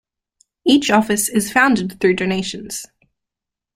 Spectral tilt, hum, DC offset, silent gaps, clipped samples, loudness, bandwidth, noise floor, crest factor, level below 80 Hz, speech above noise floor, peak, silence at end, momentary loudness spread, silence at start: -3.5 dB/octave; none; under 0.1%; none; under 0.1%; -17 LUFS; 16 kHz; -85 dBFS; 18 dB; -54 dBFS; 68 dB; -2 dBFS; 0.9 s; 13 LU; 0.65 s